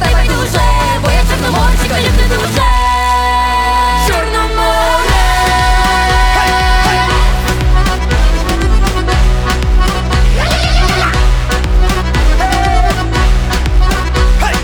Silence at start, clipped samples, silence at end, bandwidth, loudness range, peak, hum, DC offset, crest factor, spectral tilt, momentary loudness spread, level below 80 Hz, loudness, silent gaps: 0 s; under 0.1%; 0 s; 18.5 kHz; 2 LU; 0 dBFS; none; under 0.1%; 10 dB; -4.5 dB/octave; 3 LU; -12 dBFS; -12 LUFS; none